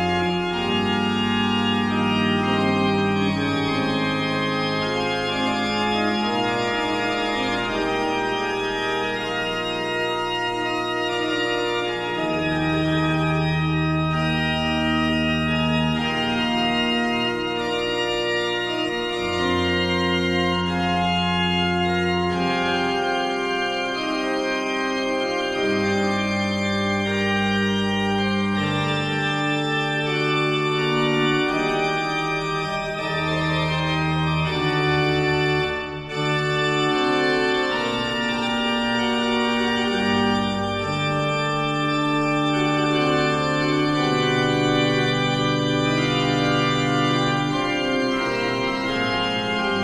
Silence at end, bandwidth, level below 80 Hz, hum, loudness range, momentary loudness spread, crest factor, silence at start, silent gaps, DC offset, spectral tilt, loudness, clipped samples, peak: 0 s; 12.5 kHz; -46 dBFS; none; 2 LU; 3 LU; 14 dB; 0 s; none; under 0.1%; -5.5 dB/octave; -22 LUFS; under 0.1%; -8 dBFS